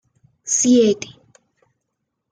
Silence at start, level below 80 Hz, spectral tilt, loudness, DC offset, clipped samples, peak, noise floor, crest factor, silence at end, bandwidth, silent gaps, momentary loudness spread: 0.45 s; -66 dBFS; -3.5 dB/octave; -16 LUFS; under 0.1%; under 0.1%; -6 dBFS; -77 dBFS; 16 dB; 1.25 s; 10 kHz; none; 22 LU